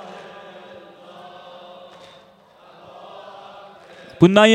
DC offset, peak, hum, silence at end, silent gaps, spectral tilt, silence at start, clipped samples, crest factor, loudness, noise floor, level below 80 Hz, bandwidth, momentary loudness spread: under 0.1%; 0 dBFS; none; 0 s; none; -5.5 dB/octave; 4.2 s; under 0.1%; 22 dB; -15 LUFS; -50 dBFS; -60 dBFS; 10.5 kHz; 27 LU